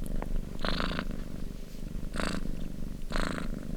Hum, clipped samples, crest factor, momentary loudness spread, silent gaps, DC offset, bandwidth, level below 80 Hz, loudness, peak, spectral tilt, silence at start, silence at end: none; under 0.1%; 22 dB; 9 LU; none; under 0.1%; 15 kHz; -36 dBFS; -37 LUFS; -10 dBFS; -5 dB/octave; 0 s; 0 s